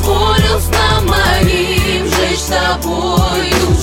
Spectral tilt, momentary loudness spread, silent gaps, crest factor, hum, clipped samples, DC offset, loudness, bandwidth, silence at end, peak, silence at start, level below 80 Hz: -4.5 dB/octave; 3 LU; none; 12 dB; none; under 0.1%; under 0.1%; -13 LUFS; 17.5 kHz; 0 s; 0 dBFS; 0 s; -20 dBFS